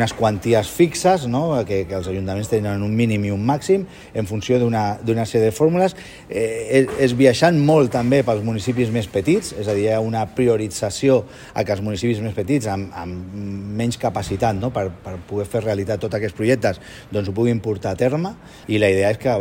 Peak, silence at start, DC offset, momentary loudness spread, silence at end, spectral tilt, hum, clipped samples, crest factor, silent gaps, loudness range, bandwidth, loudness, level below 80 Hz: 0 dBFS; 0 s; under 0.1%; 11 LU; 0 s; -6 dB/octave; none; under 0.1%; 18 dB; none; 6 LU; 16.5 kHz; -20 LUFS; -48 dBFS